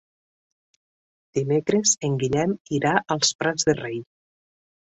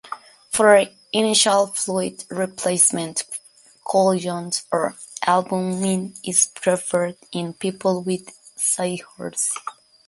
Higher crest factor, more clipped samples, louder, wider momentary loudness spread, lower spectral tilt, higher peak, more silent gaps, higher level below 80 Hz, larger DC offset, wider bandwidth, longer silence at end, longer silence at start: about the same, 20 dB vs 20 dB; neither; about the same, -23 LUFS vs -21 LUFS; second, 9 LU vs 14 LU; about the same, -3.5 dB/octave vs -3 dB/octave; about the same, -4 dBFS vs -2 dBFS; first, 2.60-2.65 s, 3.35-3.39 s vs none; first, -58 dBFS vs -66 dBFS; neither; second, 8.4 kHz vs 12 kHz; first, 0.8 s vs 0.35 s; first, 1.35 s vs 0.05 s